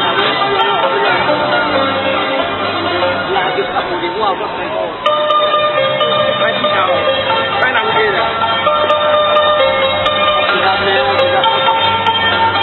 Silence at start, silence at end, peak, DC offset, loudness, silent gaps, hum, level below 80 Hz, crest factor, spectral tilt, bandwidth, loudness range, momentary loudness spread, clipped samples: 0 s; 0 s; 0 dBFS; under 0.1%; -13 LUFS; none; none; -44 dBFS; 14 dB; -6 dB/octave; 5.8 kHz; 3 LU; 5 LU; under 0.1%